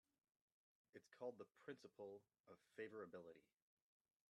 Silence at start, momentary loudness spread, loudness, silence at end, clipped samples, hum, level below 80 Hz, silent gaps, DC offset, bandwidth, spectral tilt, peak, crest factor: 0.95 s; 12 LU; -59 LUFS; 0.9 s; under 0.1%; none; under -90 dBFS; 2.40-2.44 s; under 0.1%; 11 kHz; -6 dB/octave; -40 dBFS; 20 dB